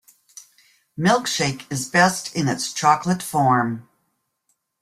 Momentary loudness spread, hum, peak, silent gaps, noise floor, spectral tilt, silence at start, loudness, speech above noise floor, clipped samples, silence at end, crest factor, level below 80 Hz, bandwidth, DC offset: 9 LU; none; -2 dBFS; none; -72 dBFS; -4 dB/octave; 0.35 s; -20 LUFS; 52 dB; under 0.1%; 1 s; 20 dB; -60 dBFS; 16 kHz; under 0.1%